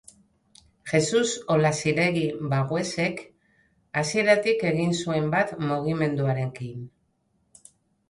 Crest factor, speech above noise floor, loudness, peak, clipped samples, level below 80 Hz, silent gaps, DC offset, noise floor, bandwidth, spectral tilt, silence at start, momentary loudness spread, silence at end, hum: 20 dB; 46 dB; -24 LUFS; -6 dBFS; under 0.1%; -62 dBFS; none; under 0.1%; -70 dBFS; 11.5 kHz; -5 dB/octave; 0.85 s; 11 LU; 1.2 s; none